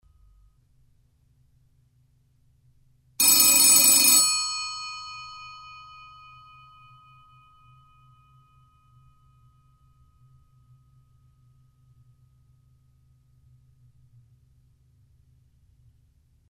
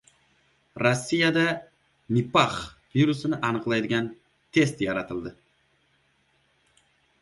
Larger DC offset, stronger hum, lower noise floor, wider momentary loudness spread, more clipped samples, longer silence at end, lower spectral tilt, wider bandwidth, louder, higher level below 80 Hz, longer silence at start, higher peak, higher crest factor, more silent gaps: neither; first, 50 Hz at -75 dBFS vs none; second, -63 dBFS vs -67 dBFS; first, 29 LU vs 13 LU; neither; first, 10.95 s vs 1.9 s; second, 1.5 dB/octave vs -5.5 dB/octave; first, 16.5 kHz vs 11.5 kHz; first, -17 LUFS vs -25 LUFS; about the same, -64 dBFS vs -60 dBFS; first, 3.2 s vs 0.75 s; first, -2 dBFS vs -6 dBFS; about the same, 26 dB vs 22 dB; neither